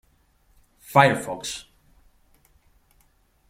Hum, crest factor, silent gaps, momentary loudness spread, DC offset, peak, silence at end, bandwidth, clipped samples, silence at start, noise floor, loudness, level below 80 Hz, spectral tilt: none; 26 dB; none; 16 LU; under 0.1%; -2 dBFS; 1.9 s; 16.5 kHz; under 0.1%; 0.9 s; -62 dBFS; -21 LUFS; -60 dBFS; -4.5 dB/octave